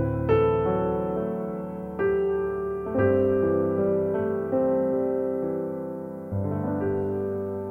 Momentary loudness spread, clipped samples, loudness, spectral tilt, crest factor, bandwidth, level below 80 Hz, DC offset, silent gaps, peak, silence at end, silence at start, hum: 9 LU; under 0.1%; -26 LUFS; -10.5 dB/octave; 16 dB; 3.3 kHz; -48 dBFS; under 0.1%; none; -10 dBFS; 0 s; 0 s; none